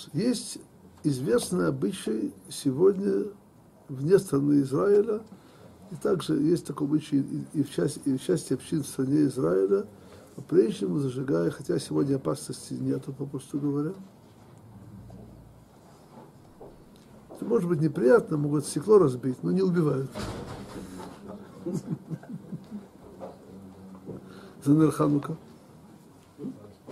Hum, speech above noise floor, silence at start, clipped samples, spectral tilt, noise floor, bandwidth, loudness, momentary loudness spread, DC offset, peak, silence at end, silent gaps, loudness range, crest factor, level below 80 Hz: none; 27 dB; 0 s; under 0.1%; -7 dB/octave; -53 dBFS; 15 kHz; -27 LUFS; 21 LU; under 0.1%; -8 dBFS; 0 s; none; 12 LU; 20 dB; -62 dBFS